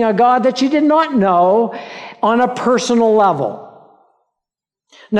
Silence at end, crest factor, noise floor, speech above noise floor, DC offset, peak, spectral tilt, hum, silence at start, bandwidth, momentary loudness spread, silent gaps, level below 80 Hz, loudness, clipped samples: 0 s; 12 dB; -84 dBFS; 71 dB; under 0.1%; -4 dBFS; -5.5 dB/octave; none; 0 s; 10.5 kHz; 10 LU; none; -62 dBFS; -14 LUFS; under 0.1%